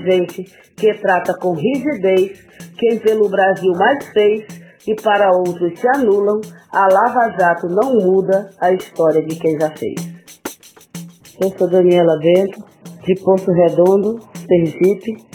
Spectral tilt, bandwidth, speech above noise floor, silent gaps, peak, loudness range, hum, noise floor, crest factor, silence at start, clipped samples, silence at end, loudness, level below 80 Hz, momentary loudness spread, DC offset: -6.5 dB/octave; 17.5 kHz; 21 dB; none; 0 dBFS; 3 LU; none; -36 dBFS; 16 dB; 0 s; under 0.1%; 0.15 s; -15 LUFS; -60 dBFS; 16 LU; under 0.1%